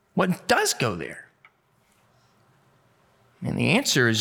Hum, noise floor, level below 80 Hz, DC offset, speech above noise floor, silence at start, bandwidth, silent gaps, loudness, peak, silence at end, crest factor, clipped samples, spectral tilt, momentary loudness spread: none; -65 dBFS; -62 dBFS; under 0.1%; 42 dB; 0.15 s; 19 kHz; none; -23 LUFS; -6 dBFS; 0 s; 20 dB; under 0.1%; -4 dB/octave; 16 LU